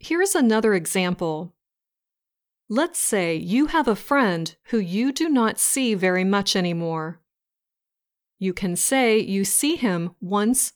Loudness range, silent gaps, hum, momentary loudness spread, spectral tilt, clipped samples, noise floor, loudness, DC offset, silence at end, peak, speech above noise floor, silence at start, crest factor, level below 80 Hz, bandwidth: 3 LU; none; none; 9 LU; -3.5 dB/octave; under 0.1%; -87 dBFS; -22 LUFS; under 0.1%; 0.05 s; -6 dBFS; 65 dB; 0.05 s; 16 dB; -54 dBFS; over 20 kHz